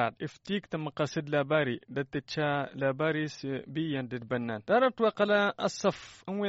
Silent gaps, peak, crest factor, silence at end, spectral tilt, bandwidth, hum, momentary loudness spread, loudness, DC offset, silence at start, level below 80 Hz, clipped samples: none; -14 dBFS; 16 dB; 0 s; -4.5 dB/octave; 8 kHz; none; 9 LU; -31 LUFS; under 0.1%; 0 s; -68 dBFS; under 0.1%